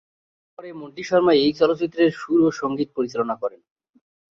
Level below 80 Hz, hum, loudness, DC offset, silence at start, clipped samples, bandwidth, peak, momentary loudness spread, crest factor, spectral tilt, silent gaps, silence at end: -62 dBFS; none; -21 LUFS; under 0.1%; 0.6 s; under 0.1%; 7.4 kHz; -6 dBFS; 19 LU; 18 dB; -6 dB/octave; none; 0.85 s